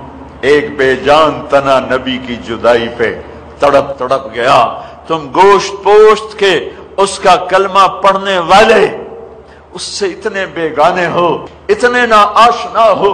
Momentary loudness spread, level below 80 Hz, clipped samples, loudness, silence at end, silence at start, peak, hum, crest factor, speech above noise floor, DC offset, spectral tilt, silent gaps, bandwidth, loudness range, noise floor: 12 LU; -40 dBFS; under 0.1%; -10 LUFS; 0 s; 0 s; 0 dBFS; none; 10 dB; 25 dB; under 0.1%; -4 dB/octave; none; 11.5 kHz; 4 LU; -34 dBFS